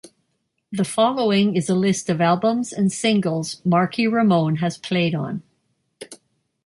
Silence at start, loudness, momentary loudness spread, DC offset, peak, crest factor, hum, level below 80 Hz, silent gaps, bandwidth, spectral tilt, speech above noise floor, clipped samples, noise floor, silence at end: 0.05 s; -20 LUFS; 11 LU; under 0.1%; -6 dBFS; 16 dB; none; -64 dBFS; none; 11.5 kHz; -5.5 dB/octave; 53 dB; under 0.1%; -72 dBFS; 0.5 s